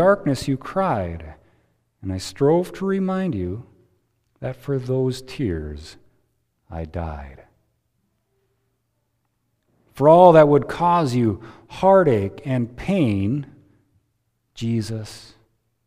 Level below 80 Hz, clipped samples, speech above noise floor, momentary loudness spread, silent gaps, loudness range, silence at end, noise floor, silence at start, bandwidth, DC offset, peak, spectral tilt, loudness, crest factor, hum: -46 dBFS; under 0.1%; 52 dB; 20 LU; none; 21 LU; 0.65 s; -72 dBFS; 0 s; 15 kHz; under 0.1%; 0 dBFS; -7.5 dB/octave; -20 LUFS; 22 dB; none